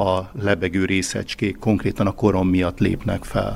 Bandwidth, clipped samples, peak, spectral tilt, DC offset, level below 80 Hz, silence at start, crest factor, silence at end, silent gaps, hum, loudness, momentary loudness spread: 15.5 kHz; under 0.1%; -2 dBFS; -6 dB/octave; under 0.1%; -38 dBFS; 0 s; 18 dB; 0 s; none; none; -21 LUFS; 5 LU